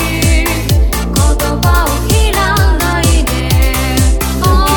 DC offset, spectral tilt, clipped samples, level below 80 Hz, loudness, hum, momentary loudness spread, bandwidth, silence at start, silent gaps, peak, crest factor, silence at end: under 0.1%; -4.5 dB/octave; under 0.1%; -14 dBFS; -12 LUFS; none; 2 LU; over 20 kHz; 0 s; none; 0 dBFS; 10 dB; 0 s